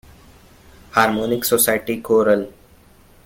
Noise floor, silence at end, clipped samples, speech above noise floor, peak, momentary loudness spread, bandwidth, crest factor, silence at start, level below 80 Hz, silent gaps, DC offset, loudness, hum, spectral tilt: -50 dBFS; 0.75 s; under 0.1%; 32 dB; -2 dBFS; 6 LU; 17 kHz; 18 dB; 0.95 s; -52 dBFS; none; under 0.1%; -18 LUFS; none; -3.5 dB/octave